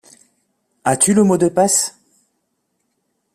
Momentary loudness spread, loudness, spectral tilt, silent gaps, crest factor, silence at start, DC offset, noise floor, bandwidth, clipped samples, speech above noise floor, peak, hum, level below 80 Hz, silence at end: 10 LU; -15 LUFS; -4 dB/octave; none; 20 dB; 0.85 s; under 0.1%; -70 dBFS; 14.5 kHz; under 0.1%; 56 dB; 0 dBFS; none; -58 dBFS; 1.45 s